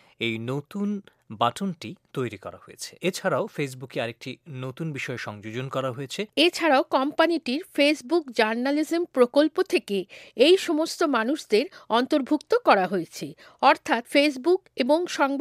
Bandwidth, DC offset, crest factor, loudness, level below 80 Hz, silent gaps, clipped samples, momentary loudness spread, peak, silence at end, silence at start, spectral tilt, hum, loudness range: 15.5 kHz; under 0.1%; 20 dB; -24 LUFS; -74 dBFS; none; under 0.1%; 14 LU; -4 dBFS; 0 s; 0.2 s; -4.5 dB/octave; none; 8 LU